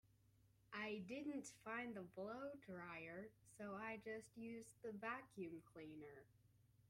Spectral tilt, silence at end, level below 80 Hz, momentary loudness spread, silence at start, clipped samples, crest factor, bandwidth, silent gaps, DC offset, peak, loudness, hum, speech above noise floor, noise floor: -5 dB/octave; 0 s; -84 dBFS; 8 LU; 0.05 s; under 0.1%; 20 dB; 16 kHz; none; under 0.1%; -34 dBFS; -53 LUFS; none; 23 dB; -76 dBFS